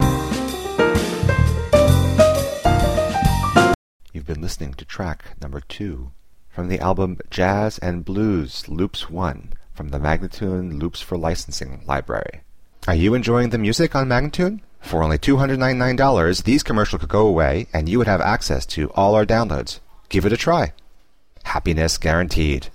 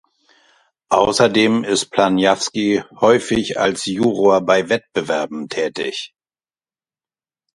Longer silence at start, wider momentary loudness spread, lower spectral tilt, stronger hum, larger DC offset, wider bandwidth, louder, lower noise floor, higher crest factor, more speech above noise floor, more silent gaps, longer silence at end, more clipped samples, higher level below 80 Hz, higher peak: second, 0 s vs 0.9 s; first, 14 LU vs 9 LU; first, -6 dB/octave vs -4 dB/octave; neither; first, 0.7% vs under 0.1%; first, 16 kHz vs 11.5 kHz; second, -20 LUFS vs -17 LUFS; second, -52 dBFS vs under -90 dBFS; about the same, 18 dB vs 18 dB; second, 32 dB vs over 73 dB; first, 3.75-4.00 s vs none; second, 0 s vs 1.5 s; neither; first, -30 dBFS vs -52 dBFS; about the same, 0 dBFS vs 0 dBFS